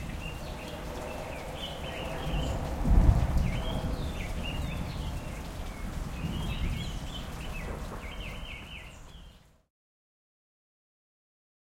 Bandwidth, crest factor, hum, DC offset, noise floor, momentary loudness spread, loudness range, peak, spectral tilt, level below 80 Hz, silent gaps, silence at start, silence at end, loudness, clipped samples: 16.5 kHz; 24 dB; none; under 0.1%; -53 dBFS; 12 LU; 14 LU; -8 dBFS; -6 dB/octave; -34 dBFS; none; 0 s; 2.35 s; -34 LUFS; under 0.1%